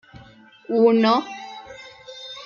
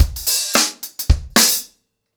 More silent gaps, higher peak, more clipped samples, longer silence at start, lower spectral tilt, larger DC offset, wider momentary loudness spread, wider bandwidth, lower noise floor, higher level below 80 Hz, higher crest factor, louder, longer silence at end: neither; second, -6 dBFS vs -2 dBFS; neither; first, 0.7 s vs 0 s; first, -6 dB/octave vs -2 dB/octave; neither; first, 24 LU vs 8 LU; second, 7.2 kHz vs over 20 kHz; second, -48 dBFS vs -57 dBFS; second, -64 dBFS vs -24 dBFS; about the same, 16 dB vs 16 dB; second, -19 LUFS vs -16 LUFS; second, 0 s vs 0.5 s